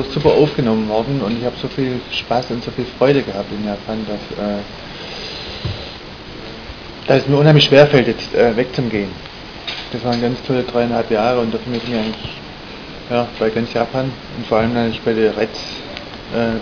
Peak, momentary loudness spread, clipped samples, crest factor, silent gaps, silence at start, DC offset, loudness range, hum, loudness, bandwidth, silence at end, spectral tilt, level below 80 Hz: 0 dBFS; 17 LU; under 0.1%; 18 dB; none; 0 s; under 0.1%; 7 LU; none; -17 LUFS; 5.4 kHz; 0 s; -6.5 dB/octave; -40 dBFS